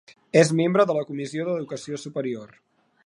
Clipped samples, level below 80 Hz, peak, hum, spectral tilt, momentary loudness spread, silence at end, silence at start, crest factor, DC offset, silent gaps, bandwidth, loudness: under 0.1%; -74 dBFS; -4 dBFS; none; -5.5 dB/octave; 13 LU; 0.6 s; 0.35 s; 22 dB; under 0.1%; none; 11 kHz; -24 LUFS